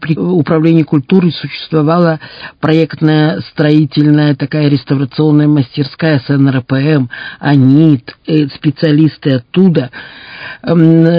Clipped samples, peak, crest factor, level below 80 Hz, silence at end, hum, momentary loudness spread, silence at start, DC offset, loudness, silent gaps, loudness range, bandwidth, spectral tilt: 0.9%; 0 dBFS; 10 dB; -50 dBFS; 0 s; none; 9 LU; 0 s; under 0.1%; -11 LUFS; none; 1 LU; 5.2 kHz; -10 dB/octave